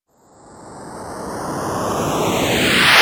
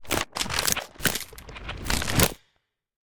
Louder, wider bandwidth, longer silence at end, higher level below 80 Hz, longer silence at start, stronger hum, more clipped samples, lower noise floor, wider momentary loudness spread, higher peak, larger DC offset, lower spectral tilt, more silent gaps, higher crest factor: first, -17 LUFS vs -26 LUFS; about the same, over 20 kHz vs over 20 kHz; second, 0 s vs 0.15 s; about the same, -44 dBFS vs -40 dBFS; first, 0.45 s vs 0.05 s; neither; neither; second, -48 dBFS vs -73 dBFS; first, 21 LU vs 15 LU; about the same, 0 dBFS vs -2 dBFS; neither; about the same, -3 dB/octave vs -2.5 dB/octave; neither; second, 18 dB vs 26 dB